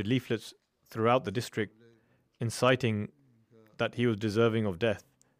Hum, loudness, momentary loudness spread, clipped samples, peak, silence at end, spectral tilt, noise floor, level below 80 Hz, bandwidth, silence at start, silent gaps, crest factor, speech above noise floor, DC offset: none; -30 LUFS; 12 LU; under 0.1%; -12 dBFS; 0.4 s; -6 dB/octave; -67 dBFS; -68 dBFS; 15.5 kHz; 0 s; none; 18 dB; 38 dB; under 0.1%